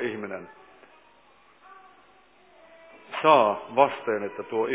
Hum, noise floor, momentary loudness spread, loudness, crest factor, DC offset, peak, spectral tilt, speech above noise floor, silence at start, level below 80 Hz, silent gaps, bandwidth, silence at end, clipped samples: none; -58 dBFS; 18 LU; -24 LUFS; 22 dB; under 0.1%; -6 dBFS; -8.5 dB/octave; 35 dB; 0 s; -76 dBFS; none; 4 kHz; 0 s; under 0.1%